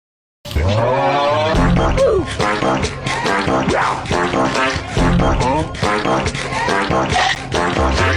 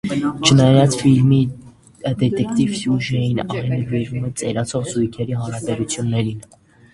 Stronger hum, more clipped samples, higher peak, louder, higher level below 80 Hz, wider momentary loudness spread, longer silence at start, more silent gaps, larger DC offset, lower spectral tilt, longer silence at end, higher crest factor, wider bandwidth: neither; neither; second, -6 dBFS vs 0 dBFS; about the same, -16 LUFS vs -18 LUFS; first, -26 dBFS vs -48 dBFS; second, 4 LU vs 11 LU; first, 0.45 s vs 0.05 s; neither; neither; about the same, -5 dB/octave vs -6 dB/octave; second, 0 s vs 0.5 s; second, 10 dB vs 18 dB; first, 14.5 kHz vs 11.5 kHz